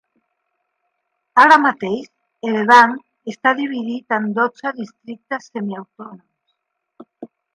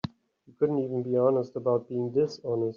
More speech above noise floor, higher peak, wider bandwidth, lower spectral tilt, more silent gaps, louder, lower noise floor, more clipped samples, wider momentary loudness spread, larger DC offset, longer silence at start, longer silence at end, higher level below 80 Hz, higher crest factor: first, 57 dB vs 33 dB; first, 0 dBFS vs -12 dBFS; first, 11.5 kHz vs 7.2 kHz; second, -4.5 dB/octave vs -8 dB/octave; neither; first, -16 LUFS vs -28 LUFS; first, -73 dBFS vs -60 dBFS; neither; first, 22 LU vs 5 LU; neither; first, 1.35 s vs 0.05 s; first, 0.3 s vs 0.05 s; about the same, -72 dBFS vs -68 dBFS; about the same, 20 dB vs 16 dB